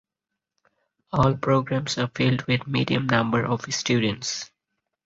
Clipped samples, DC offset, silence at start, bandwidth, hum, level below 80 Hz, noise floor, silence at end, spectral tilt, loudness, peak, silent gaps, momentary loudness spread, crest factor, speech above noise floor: under 0.1%; under 0.1%; 1.15 s; 7.8 kHz; none; -52 dBFS; -85 dBFS; 0.6 s; -5 dB/octave; -24 LUFS; -6 dBFS; none; 7 LU; 20 dB; 62 dB